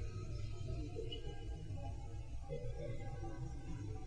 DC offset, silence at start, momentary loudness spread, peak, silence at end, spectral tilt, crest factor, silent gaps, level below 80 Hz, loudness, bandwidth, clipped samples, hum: under 0.1%; 0 s; 3 LU; -32 dBFS; 0 s; -6.5 dB/octave; 12 dB; none; -48 dBFS; -48 LUFS; 10 kHz; under 0.1%; none